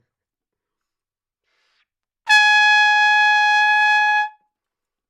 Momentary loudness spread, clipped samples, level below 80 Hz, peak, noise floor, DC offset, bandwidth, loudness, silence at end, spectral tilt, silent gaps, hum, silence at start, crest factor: 8 LU; under 0.1%; -86 dBFS; 0 dBFS; -88 dBFS; under 0.1%; 12.5 kHz; -13 LUFS; 0.8 s; 7 dB/octave; none; none; 2.25 s; 18 dB